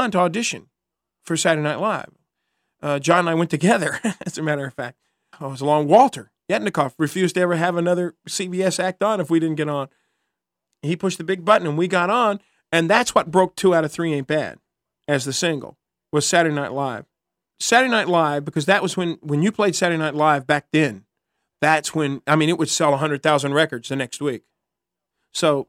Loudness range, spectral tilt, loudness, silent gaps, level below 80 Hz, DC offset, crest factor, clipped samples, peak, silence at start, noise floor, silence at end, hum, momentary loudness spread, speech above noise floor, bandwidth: 3 LU; -4.5 dB/octave; -20 LUFS; none; -66 dBFS; under 0.1%; 20 dB; under 0.1%; 0 dBFS; 0 s; -84 dBFS; 0.05 s; none; 10 LU; 64 dB; 16 kHz